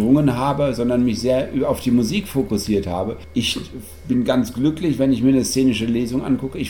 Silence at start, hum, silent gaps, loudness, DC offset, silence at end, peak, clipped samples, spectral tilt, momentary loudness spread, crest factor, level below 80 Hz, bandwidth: 0 s; none; none; -20 LUFS; 0.6%; 0 s; -4 dBFS; under 0.1%; -6 dB/octave; 6 LU; 14 dB; -40 dBFS; 18 kHz